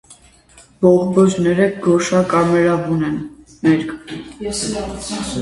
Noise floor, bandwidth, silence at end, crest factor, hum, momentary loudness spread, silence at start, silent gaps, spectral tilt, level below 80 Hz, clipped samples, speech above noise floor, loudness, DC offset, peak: -48 dBFS; 11.5 kHz; 0 s; 16 dB; none; 13 LU; 0.1 s; none; -6 dB/octave; -44 dBFS; under 0.1%; 31 dB; -17 LUFS; under 0.1%; 0 dBFS